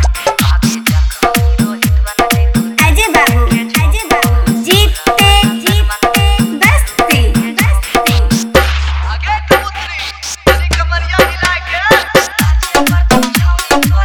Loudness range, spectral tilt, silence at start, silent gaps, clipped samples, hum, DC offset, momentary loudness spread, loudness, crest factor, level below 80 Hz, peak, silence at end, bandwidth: 3 LU; -4.5 dB/octave; 0 s; none; 0.3%; none; under 0.1%; 5 LU; -11 LUFS; 10 dB; -16 dBFS; 0 dBFS; 0 s; over 20 kHz